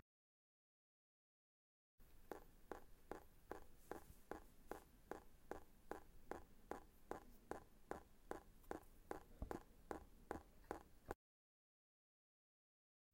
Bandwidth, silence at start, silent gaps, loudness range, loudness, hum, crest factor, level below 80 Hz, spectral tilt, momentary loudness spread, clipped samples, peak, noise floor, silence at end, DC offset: 16.5 kHz; 2 s; none; 5 LU; -58 LUFS; none; 28 dB; -68 dBFS; -5.5 dB/octave; 3 LU; under 0.1%; -30 dBFS; under -90 dBFS; 2 s; under 0.1%